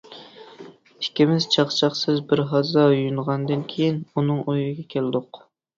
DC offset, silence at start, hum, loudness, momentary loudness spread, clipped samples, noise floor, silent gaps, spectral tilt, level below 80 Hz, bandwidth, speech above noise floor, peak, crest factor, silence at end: under 0.1%; 0.1 s; none; -22 LUFS; 10 LU; under 0.1%; -45 dBFS; none; -6 dB/octave; -62 dBFS; 7.6 kHz; 23 dB; -4 dBFS; 18 dB; 0.4 s